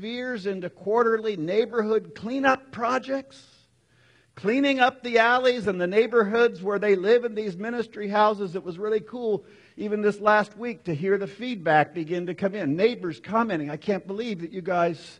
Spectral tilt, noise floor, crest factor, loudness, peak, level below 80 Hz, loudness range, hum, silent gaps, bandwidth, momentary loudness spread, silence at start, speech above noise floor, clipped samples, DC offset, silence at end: -6 dB/octave; -61 dBFS; 18 dB; -25 LUFS; -6 dBFS; -68 dBFS; 5 LU; none; none; 9.8 kHz; 11 LU; 0 s; 37 dB; under 0.1%; under 0.1%; 0.05 s